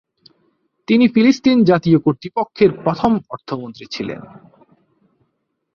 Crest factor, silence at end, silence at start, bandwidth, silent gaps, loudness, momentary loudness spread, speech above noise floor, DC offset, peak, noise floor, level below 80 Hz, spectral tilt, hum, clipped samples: 16 dB; 1.5 s; 0.9 s; 6.8 kHz; none; -16 LUFS; 15 LU; 55 dB; under 0.1%; -2 dBFS; -71 dBFS; -54 dBFS; -7 dB/octave; none; under 0.1%